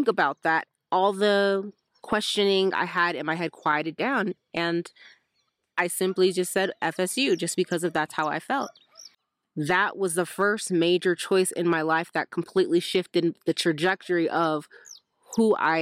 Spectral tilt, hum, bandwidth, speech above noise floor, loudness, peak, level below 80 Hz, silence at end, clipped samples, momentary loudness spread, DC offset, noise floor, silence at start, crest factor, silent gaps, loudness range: -4 dB/octave; none; 15.5 kHz; 50 dB; -25 LUFS; -10 dBFS; -70 dBFS; 0 s; under 0.1%; 7 LU; under 0.1%; -75 dBFS; 0 s; 16 dB; none; 3 LU